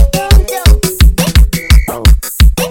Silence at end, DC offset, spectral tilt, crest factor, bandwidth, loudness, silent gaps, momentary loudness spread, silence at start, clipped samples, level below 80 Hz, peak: 0 s; under 0.1%; -4.5 dB/octave; 8 dB; 17.5 kHz; -10 LUFS; none; 2 LU; 0 s; 4%; -8 dBFS; 0 dBFS